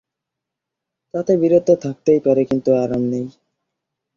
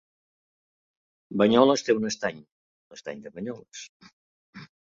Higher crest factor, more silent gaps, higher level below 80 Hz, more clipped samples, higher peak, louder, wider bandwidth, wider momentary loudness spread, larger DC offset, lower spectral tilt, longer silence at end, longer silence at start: second, 18 dB vs 24 dB; second, none vs 2.52-2.90 s, 3.89-4.00 s, 4.13-4.53 s; first, -56 dBFS vs -68 dBFS; neither; about the same, -2 dBFS vs -4 dBFS; first, -17 LUFS vs -24 LUFS; about the same, 7.2 kHz vs 7.6 kHz; second, 11 LU vs 23 LU; neither; first, -8.5 dB/octave vs -4.5 dB/octave; first, 0.85 s vs 0.25 s; second, 1.15 s vs 1.3 s